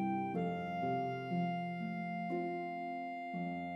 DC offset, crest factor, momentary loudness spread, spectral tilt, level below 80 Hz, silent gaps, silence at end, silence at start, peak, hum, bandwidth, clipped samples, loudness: under 0.1%; 12 dB; 5 LU; -9 dB/octave; -80 dBFS; none; 0 s; 0 s; -26 dBFS; none; 6 kHz; under 0.1%; -39 LUFS